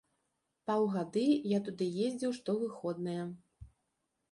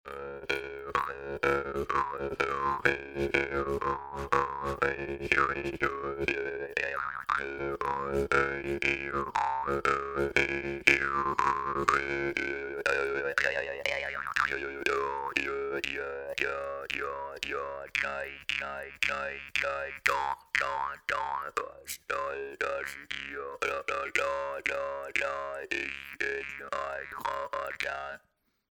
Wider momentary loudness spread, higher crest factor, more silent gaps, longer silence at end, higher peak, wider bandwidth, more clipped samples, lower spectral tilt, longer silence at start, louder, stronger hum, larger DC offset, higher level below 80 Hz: about the same, 10 LU vs 8 LU; second, 16 dB vs 28 dB; neither; about the same, 0.65 s vs 0.55 s; second, -20 dBFS vs -4 dBFS; second, 11.5 kHz vs over 20 kHz; neither; first, -7 dB/octave vs -4 dB/octave; first, 0.65 s vs 0.05 s; second, -34 LUFS vs -31 LUFS; neither; neither; second, -70 dBFS vs -54 dBFS